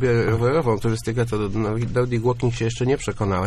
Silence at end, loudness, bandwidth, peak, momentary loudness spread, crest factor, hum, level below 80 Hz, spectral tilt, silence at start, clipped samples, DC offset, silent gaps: 0 s; -22 LUFS; 12.5 kHz; -6 dBFS; 4 LU; 14 dB; none; -40 dBFS; -7 dB/octave; 0 s; under 0.1%; under 0.1%; none